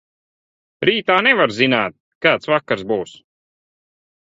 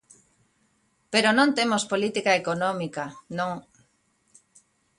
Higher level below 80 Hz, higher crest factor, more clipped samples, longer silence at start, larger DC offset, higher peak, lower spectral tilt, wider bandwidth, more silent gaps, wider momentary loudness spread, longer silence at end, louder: first, -60 dBFS vs -68 dBFS; about the same, 20 dB vs 20 dB; neither; second, 0.8 s vs 1.1 s; neither; first, 0 dBFS vs -6 dBFS; first, -5 dB/octave vs -3.5 dB/octave; second, 8 kHz vs 11.5 kHz; first, 2.00-2.21 s vs none; second, 10 LU vs 13 LU; second, 1.2 s vs 1.4 s; first, -17 LUFS vs -24 LUFS